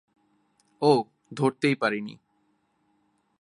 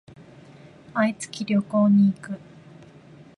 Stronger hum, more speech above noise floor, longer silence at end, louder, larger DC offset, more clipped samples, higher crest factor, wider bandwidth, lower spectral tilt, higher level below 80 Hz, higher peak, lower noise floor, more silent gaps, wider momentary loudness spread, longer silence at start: neither; first, 46 dB vs 27 dB; first, 1.25 s vs 1 s; second, -25 LUFS vs -22 LUFS; neither; neither; first, 22 dB vs 14 dB; about the same, 11.5 kHz vs 11.5 kHz; about the same, -6 dB/octave vs -7 dB/octave; second, -76 dBFS vs -66 dBFS; first, -6 dBFS vs -12 dBFS; first, -70 dBFS vs -48 dBFS; neither; second, 14 LU vs 17 LU; second, 0.8 s vs 0.95 s